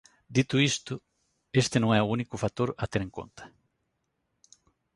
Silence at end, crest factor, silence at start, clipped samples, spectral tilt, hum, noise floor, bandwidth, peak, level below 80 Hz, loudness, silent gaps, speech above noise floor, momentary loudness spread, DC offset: 1.5 s; 20 dB; 0.3 s; under 0.1%; -5 dB/octave; none; -78 dBFS; 11.5 kHz; -10 dBFS; -56 dBFS; -28 LUFS; none; 51 dB; 16 LU; under 0.1%